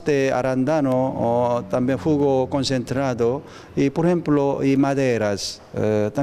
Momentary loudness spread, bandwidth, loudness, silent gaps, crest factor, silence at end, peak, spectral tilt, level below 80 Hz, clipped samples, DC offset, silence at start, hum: 5 LU; 13 kHz; -21 LUFS; none; 14 dB; 0 s; -8 dBFS; -6.5 dB/octave; -52 dBFS; under 0.1%; under 0.1%; 0 s; none